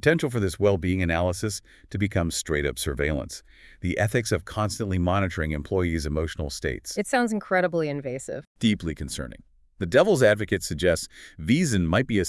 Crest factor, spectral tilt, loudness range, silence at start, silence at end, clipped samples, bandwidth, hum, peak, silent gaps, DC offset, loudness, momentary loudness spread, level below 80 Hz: 22 dB; -5.5 dB/octave; 3 LU; 0.05 s; 0 s; under 0.1%; 12 kHz; none; -4 dBFS; 8.47-8.55 s; under 0.1%; -25 LUFS; 12 LU; -44 dBFS